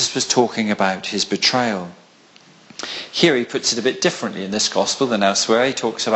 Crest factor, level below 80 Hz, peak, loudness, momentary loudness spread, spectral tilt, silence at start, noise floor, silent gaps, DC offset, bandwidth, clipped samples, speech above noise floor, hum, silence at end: 18 dB; -60 dBFS; -2 dBFS; -19 LUFS; 11 LU; -3 dB/octave; 0 s; -49 dBFS; none; under 0.1%; 8.6 kHz; under 0.1%; 30 dB; none; 0 s